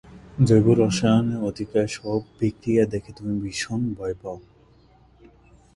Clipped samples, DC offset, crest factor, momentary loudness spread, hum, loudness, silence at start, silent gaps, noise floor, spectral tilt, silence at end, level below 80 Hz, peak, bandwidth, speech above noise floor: under 0.1%; under 0.1%; 20 dB; 13 LU; none; -23 LUFS; 0.1 s; none; -55 dBFS; -6.5 dB/octave; 1.35 s; -48 dBFS; -4 dBFS; 11.5 kHz; 33 dB